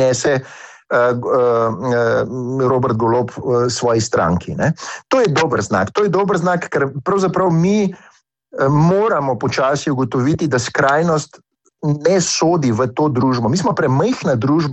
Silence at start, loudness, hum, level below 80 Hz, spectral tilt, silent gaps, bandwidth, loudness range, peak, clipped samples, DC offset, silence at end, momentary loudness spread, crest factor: 0 s; -16 LUFS; none; -48 dBFS; -5.5 dB/octave; none; 8.6 kHz; 1 LU; -2 dBFS; under 0.1%; under 0.1%; 0 s; 5 LU; 14 dB